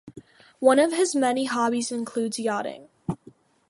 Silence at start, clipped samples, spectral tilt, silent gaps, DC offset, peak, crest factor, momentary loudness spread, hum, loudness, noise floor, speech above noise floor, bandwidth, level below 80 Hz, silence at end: 0.05 s; under 0.1%; -4 dB/octave; none; under 0.1%; -4 dBFS; 20 dB; 15 LU; none; -24 LUFS; -53 dBFS; 30 dB; 11.5 kHz; -64 dBFS; 0.55 s